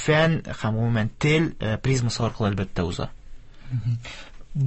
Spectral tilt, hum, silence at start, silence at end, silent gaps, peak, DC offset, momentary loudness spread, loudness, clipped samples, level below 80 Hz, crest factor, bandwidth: -6 dB/octave; none; 0 s; 0 s; none; -8 dBFS; under 0.1%; 12 LU; -25 LUFS; under 0.1%; -42 dBFS; 16 dB; 8.6 kHz